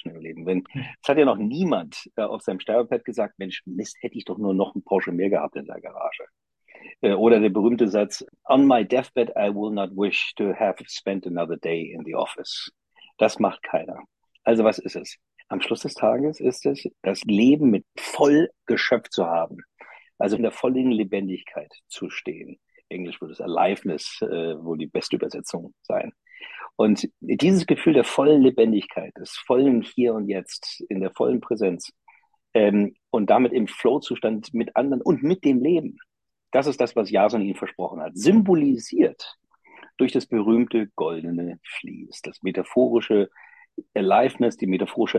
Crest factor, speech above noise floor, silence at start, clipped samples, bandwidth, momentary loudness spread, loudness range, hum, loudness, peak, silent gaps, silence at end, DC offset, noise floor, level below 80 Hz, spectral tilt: 18 dB; 36 dB; 0.05 s; under 0.1%; 12 kHz; 16 LU; 7 LU; none; -23 LUFS; -4 dBFS; none; 0 s; under 0.1%; -58 dBFS; -66 dBFS; -6 dB/octave